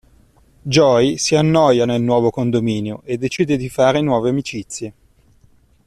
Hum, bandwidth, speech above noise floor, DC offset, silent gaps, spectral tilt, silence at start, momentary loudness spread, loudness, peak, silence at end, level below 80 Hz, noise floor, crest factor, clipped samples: none; 13.5 kHz; 37 dB; under 0.1%; none; -5.5 dB/octave; 0.65 s; 13 LU; -16 LUFS; -2 dBFS; 0.95 s; -48 dBFS; -53 dBFS; 16 dB; under 0.1%